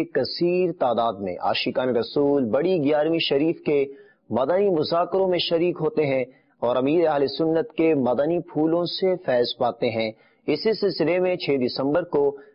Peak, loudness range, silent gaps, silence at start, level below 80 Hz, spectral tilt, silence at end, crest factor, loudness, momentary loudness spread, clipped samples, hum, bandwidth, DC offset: -10 dBFS; 1 LU; none; 0 s; -62 dBFS; -10.5 dB/octave; 0.15 s; 12 dB; -23 LUFS; 4 LU; under 0.1%; none; 5.6 kHz; under 0.1%